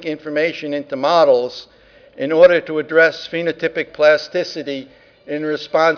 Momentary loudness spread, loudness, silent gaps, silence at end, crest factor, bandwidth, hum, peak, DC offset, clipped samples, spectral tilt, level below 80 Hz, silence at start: 15 LU; -17 LUFS; none; 0 s; 16 dB; 5.4 kHz; none; 0 dBFS; under 0.1%; under 0.1%; -5 dB/octave; -60 dBFS; 0 s